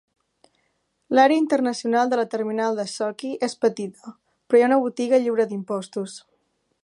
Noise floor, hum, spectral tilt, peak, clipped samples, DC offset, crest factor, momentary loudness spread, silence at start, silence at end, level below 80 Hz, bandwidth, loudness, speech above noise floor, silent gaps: -71 dBFS; none; -5 dB/octave; -4 dBFS; under 0.1%; under 0.1%; 20 dB; 14 LU; 1.1 s; 0.65 s; -78 dBFS; 11.5 kHz; -22 LUFS; 49 dB; none